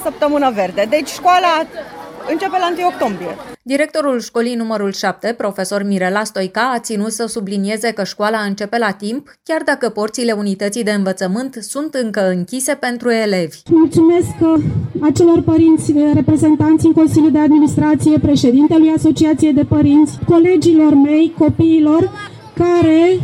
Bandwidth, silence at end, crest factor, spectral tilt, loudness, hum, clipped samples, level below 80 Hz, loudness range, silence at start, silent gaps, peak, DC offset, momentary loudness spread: 15 kHz; 0 s; 12 dB; -6 dB/octave; -14 LUFS; none; under 0.1%; -44 dBFS; 7 LU; 0 s; none; -2 dBFS; under 0.1%; 9 LU